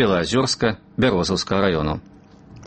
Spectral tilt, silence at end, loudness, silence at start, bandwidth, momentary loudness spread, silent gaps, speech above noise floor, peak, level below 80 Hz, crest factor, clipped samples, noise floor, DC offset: -5 dB/octave; 0 s; -20 LUFS; 0 s; 8.8 kHz; 5 LU; none; 24 dB; -4 dBFS; -42 dBFS; 18 dB; under 0.1%; -44 dBFS; under 0.1%